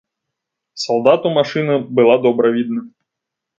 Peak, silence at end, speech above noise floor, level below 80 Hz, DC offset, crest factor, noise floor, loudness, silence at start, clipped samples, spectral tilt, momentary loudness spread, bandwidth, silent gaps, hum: 0 dBFS; 0.7 s; 67 dB; -66 dBFS; under 0.1%; 16 dB; -81 dBFS; -15 LUFS; 0.75 s; under 0.1%; -6 dB/octave; 10 LU; 7.8 kHz; none; none